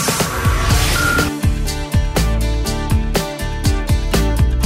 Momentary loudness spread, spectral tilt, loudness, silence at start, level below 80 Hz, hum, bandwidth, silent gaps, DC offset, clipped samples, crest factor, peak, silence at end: 5 LU; -4.5 dB/octave; -17 LUFS; 0 s; -20 dBFS; none; 16.5 kHz; none; under 0.1%; under 0.1%; 12 dB; -4 dBFS; 0 s